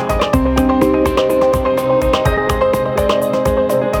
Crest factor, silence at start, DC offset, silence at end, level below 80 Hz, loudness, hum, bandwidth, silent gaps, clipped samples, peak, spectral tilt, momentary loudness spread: 12 dB; 0 s; under 0.1%; 0 s; -26 dBFS; -15 LUFS; none; 19.5 kHz; none; under 0.1%; -2 dBFS; -6 dB/octave; 2 LU